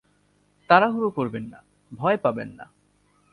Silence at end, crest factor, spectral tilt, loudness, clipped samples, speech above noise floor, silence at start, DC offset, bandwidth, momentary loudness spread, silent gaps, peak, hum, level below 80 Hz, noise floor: 0.7 s; 22 dB; -7.5 dB/octave; -22 LUFS; under 0.1%; 41 dB; 0.7 s; under 0.1%; 11 kHz; 18 LU; none; -2 dBFS; none; -64 dBFS; -64 dBFS